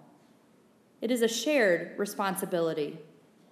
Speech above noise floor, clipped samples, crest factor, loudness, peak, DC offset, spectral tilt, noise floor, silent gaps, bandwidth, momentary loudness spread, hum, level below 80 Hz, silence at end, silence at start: 33 dB; under 0.1%; 18 dB; -29 LUFS; -14 dBFS; under 0.1%; -4 dB/octave; -62 dBFS; none; 15.5 kHz; 12 LU; none; -88 dBFS; 0.5 s; 1 s